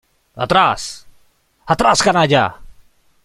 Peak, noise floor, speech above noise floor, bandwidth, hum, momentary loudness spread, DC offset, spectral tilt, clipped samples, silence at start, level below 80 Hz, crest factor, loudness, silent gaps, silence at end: 0 dBFS; -56 dBFS; 41 dB; 14 kHz; none; 14 LU; under 0.1%; -4 dB/octave; under 0.1%; 0.35 s; -44 dBFS; 16 dB; -15 LUFS; none; 0.55 s